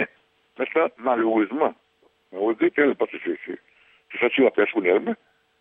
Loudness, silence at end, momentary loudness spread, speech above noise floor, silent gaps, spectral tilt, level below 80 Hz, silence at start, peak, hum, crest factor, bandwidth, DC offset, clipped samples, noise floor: -23 LUFS; 0.45 s; 15 LU; 38 dB; none; -8 dB/octave; -78 dBFS; 0 s; -6 dBFS; none; 18 dB; 3.8 kHz; under 0.1%; under 0.1%; -60 dBFS